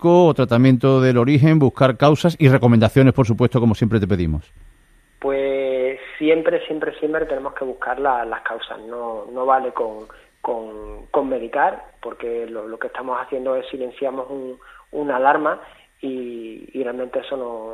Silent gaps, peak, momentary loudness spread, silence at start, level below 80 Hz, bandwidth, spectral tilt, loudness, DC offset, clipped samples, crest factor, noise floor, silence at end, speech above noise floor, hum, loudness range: none; 0 dBFS; 16 LU; 0 s; -44 dBFS; 13 kHz; -8 dB/octave; -19 LUFS; under 0.1%; under 0.1%; 18 dB; -53 dBFS; 0 s; 35 dB; none; 10 LU